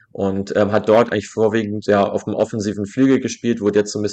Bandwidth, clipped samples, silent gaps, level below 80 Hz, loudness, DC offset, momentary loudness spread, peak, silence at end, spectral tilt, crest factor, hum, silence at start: 9 kHz; under 0.1%; none; -58 dBFS; -18 LUFS; under 0.1%; 7 LU; -2 dBFS; 0 s; -6 dB/octave; 14 dB; none; 0.15 s